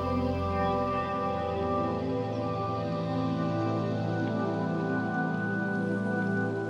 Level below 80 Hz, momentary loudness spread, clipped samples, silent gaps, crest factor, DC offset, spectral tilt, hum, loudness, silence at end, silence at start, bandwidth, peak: -52 dBFS; 2 LU; under 0.1%; none; 14 dB; under 0.1%; -8 dB/octave; none; -30 LUFS; 0 s; 0 s; 10 kHz; -16 dBFS